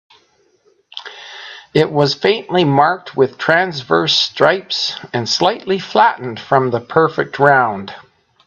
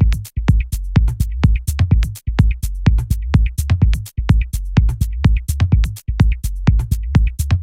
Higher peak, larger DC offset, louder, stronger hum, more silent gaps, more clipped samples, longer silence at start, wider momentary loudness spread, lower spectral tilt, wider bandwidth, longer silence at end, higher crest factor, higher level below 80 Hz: about the same, 0 dBFS vs 0 dBFS; neither; first, -15 LUFS vs -18 LUFS; neither; neither; neither; first, 0.95 s vs 0 s; first, 19 LU vs 3 LU; second, -4.5 dB/octave vs -6.5 dB/octave; second, 8.2 kHz vs 16 kHz; first, 0.45 s vs 0 s; about the same, 16 dB vs 14 dB; second, -60 dBFS vs -18 dBFS